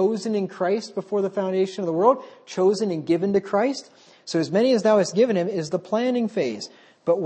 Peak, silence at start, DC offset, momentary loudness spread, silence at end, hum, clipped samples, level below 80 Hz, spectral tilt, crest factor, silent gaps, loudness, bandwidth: -4 dBFS; 0 s; under 0.1%; 9 LU; 0 s; none; under 0.1%; -72 dBFS; -6 dB/octave; 18 dB; none; -23 LUFS; 8.8 kHz